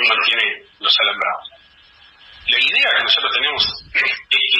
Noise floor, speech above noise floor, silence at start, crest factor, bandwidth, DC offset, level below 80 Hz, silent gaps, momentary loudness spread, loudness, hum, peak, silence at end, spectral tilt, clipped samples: -49 dBFS; 31 dB; 0 s; 16 dB; 13.5 kHz; under 0.1%; -54 dBFS; none; 8 LU; -15 LUFS; none; -4 dBFS; 0 s; -1 dB/octave; under 0.1%